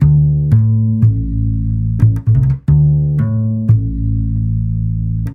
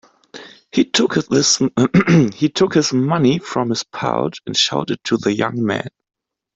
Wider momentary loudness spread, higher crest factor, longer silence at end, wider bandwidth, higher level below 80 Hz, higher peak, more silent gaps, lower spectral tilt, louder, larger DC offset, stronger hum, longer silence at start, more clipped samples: about the same, 6 LU vs 8 LU; about the same, 12 dB vs 16 dB; second, 0 s vs 0.7 s; second, 2.1 kHz vs 8.2 kHz; first, -22 dBFS vs -54 dBFS; about the same, 0 dBFS vs -2 dBFS; neither; first, -12 dB/octave vs -4.5 dB/octave; first, -14 LUFS vs -17 LUFS; neither; neither; second, 0 s vs 0.35 s; neither